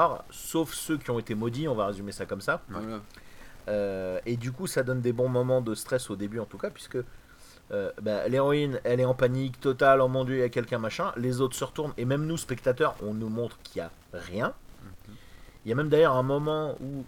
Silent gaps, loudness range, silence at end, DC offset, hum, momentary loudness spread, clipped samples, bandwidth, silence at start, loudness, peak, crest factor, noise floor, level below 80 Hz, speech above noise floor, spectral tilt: none; 6 LU; 0 s; under 0.1%; none; 13 LU; under 0.1%; 18 kHz; 0 s; -29 LUFS; -8 dBFS; 20 dB; -49 dBFS; -54 dBFS; 20 dB; -6 dB/octave